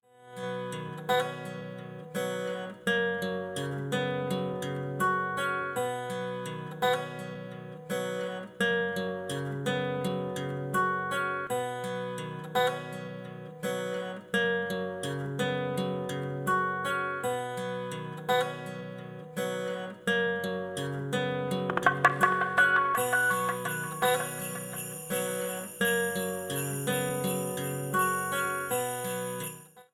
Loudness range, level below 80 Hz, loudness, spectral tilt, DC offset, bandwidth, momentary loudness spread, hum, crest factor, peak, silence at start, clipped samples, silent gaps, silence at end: 6 LU; -70 dBFS; -31 LUFS; -4 dB/octave; under 0.1%; 19 kHz; 11 LU; none; 24 dB; -8 dBFS; 0.2 s; under 0.1%; none; 0.1 s